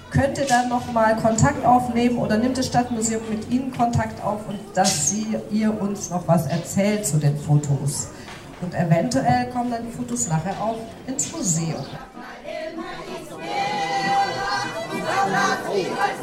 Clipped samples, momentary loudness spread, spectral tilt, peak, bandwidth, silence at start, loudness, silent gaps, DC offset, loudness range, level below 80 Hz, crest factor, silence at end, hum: under 0.1%; 13 LU; -4.5 dB/octave; -6 dBFS; 15.5 kHz; 0 s; -22 LUFS; none; under 0.1%; 6 LU; -50 dBFS; 18 dB; 0 s; none